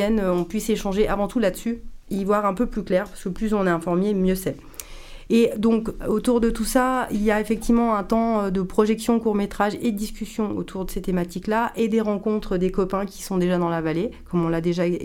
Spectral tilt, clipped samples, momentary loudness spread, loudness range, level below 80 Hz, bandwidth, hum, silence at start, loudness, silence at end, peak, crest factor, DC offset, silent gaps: -6 dB/octave; under 0.1%; 8 LU; 3 LU; -38 dBFS; 17 kHz; none; 0 s; -23 LUFS; 0 s; -6 dBFS; 18 dB; under 0.1%; none